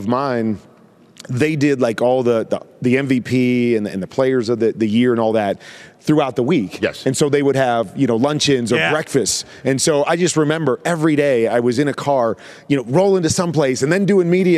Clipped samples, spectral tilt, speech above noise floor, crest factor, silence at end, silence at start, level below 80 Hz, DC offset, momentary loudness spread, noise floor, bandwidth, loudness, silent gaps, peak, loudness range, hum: under 0.1%; -5 dB/octave; 28 dB; 14 dB; 0 s; 0 s; -56 dBFS; under 0.1%; 6 LU; -44 dBFS; 14.5 kHz; -17 LUFS; none; -4 dBFS; 1 LU; none